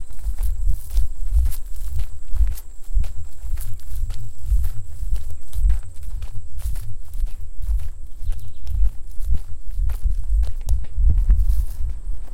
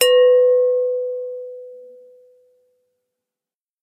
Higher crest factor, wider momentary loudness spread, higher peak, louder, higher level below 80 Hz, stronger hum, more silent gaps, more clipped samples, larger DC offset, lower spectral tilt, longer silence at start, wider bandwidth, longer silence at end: second, 12 dB vs 18 dB; second, 11 LU vs 24 LU; second, -4 dBFS vs 0 dBFS; second, -28 LUFS vs -16 LUFS; first, -22 dBFS vs -88 dBFS; neither; neither; neither; neither; first, -6 dB/octave vs 2.5 dB/octave; about the same, 0 s vs 0 s; about the same, 15.5 kHz vs 15.5 kHz; second, 0 s vs 2 s